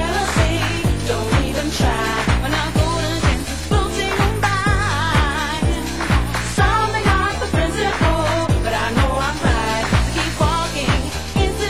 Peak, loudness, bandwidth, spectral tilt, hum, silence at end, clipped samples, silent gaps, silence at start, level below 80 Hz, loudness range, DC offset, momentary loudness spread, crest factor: -2 dBFS; -19 LUFS; 16 kHz; -5 dB/octave; none; 0 s; under 0.1%; none; 0 s; -24 dBFS; 1 LU; 2%; 3 LU; 16 dB